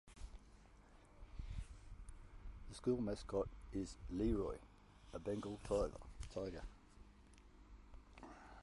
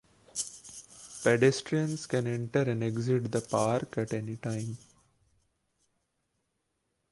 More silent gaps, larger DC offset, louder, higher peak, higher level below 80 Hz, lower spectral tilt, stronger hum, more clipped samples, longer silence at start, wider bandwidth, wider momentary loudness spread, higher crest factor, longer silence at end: neither; neither; second, -45 LUFS vs -31 LUFS; second, -28 dBFS vs -10 dBFS; first, -54 dBFS vs -68 dBFS; first, -7 dB/octave vs -5.5 dB/octave; neither; neither; second, 0.05 s vs 0.35 s; about the same, 11.5 kHz vs 11.5 kHz; first, 25 LU vs 17 LU; about the same, 20 dB vs 22 dB; second, 0 s vs 2.35 s